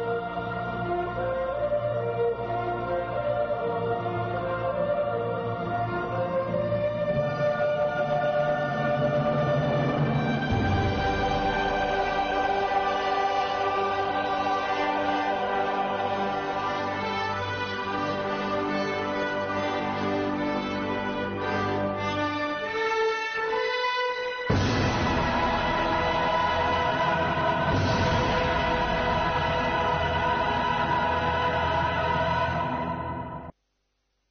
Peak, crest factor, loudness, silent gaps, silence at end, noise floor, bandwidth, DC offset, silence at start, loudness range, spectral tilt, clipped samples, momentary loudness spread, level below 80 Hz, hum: -10 dBFS; 16 dB; -26 LUFS; none; 0.8 s; -75 dBFS; 6.6 kHz; under 0.1%; 0 s; 4 LU; -4 dB/octave; under 0.1%; 5 LU; -44 dBFS; none